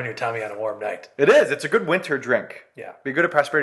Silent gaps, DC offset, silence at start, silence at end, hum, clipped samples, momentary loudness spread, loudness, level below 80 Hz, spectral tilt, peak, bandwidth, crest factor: none; under 0.1%; 0 s; 0 s; none; under 0.1%; 16 LU; -21 LUFS; -70 dBFS; -5 dB/octave; -2 dBFS; 12.5 kHz; 20 dB